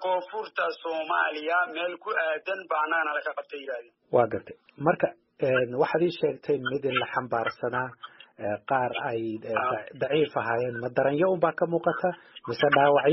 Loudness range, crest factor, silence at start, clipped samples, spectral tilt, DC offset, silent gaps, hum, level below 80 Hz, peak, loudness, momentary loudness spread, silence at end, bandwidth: 3 LU; 20 dB; 0 s; under 0.1%; -3.5 dB/octave; under 0.1%; none; none; -70 dBFS; -8 dBFS; -27 LUFS; 10 LU; 0 s; 5.8 kHz